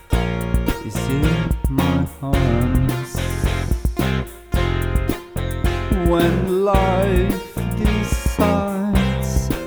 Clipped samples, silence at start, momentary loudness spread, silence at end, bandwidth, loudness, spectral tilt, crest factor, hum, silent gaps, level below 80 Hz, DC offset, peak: under 0.1%; 0.1 s; 7 LU; 0 s; over 20 kHz; -20 LUFS; -6.5 dB/octave; 18 dB; none; none; -24 dBFS; under 0.1%; -2 dBFS